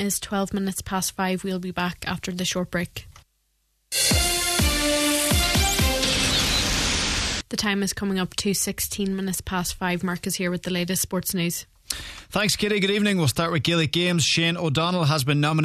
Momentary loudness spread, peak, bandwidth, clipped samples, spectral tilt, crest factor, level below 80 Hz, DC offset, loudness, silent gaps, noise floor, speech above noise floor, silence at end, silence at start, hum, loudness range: 8 LU; -4 dBFS; 14 kHz; under 0.1%; -3.5 dB/octave; 20 dB; -36 dBFS; under 0.1%; -23 LUFS; none; -70 dBFS; 45 dB; 0 s; 0 s; none; 6 LU